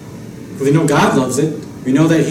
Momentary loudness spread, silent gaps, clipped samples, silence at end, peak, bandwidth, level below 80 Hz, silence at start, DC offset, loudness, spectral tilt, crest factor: 19 LU; none; under 0.1%; 0 s; -2 dBFS; 15.5 kHz; -50 dBFS; 0 s; under 0.1%; -14 LUFS; -6 dB/octave; 12 dB